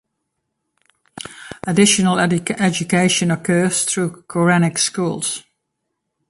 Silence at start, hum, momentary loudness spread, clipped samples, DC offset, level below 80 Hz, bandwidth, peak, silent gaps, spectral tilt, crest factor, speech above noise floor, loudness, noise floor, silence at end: 1.15 s; none; 16 LU; under 0.1%; under 0.1%; -56 dBFS; 11.5 kHz; 0 dBFS; none; -4 dB/octave; 18 dB; 59 dB; -17 LUFS; -76 dBFS; 0.9 s